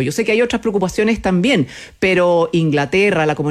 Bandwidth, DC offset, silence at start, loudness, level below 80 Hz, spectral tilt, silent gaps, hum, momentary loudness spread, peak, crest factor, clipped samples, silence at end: 14 kHz; under 0.1%; 0 s; -16 LUFS; -42 dBFS; -5.5 dB/octave; none; none; 4 LU; -4 dBFS; 10 dB; under 0.1%; 0 s